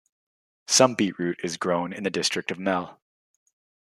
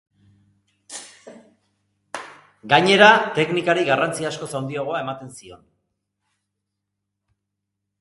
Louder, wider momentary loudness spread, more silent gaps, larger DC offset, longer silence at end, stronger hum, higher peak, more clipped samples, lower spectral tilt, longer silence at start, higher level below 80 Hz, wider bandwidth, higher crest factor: second, -24 LUFS vs -18 LUFS; second, 10 LU vs 24 LU; neither; neither; second, 1 s vs 2.45 s; second, none vs 50 Hz at -50 dBFS; about the same, -2 dBFS vs 0 dBFS; neither; about the same, -3 dB/octave vs -4 dB/octave; second, 0.7 s vs 0.9 s; second, -72 dBFS vs -66 dBFS; first, 14 kHz vs 11.5 kHz; about the same, 24 dB vs 24 dB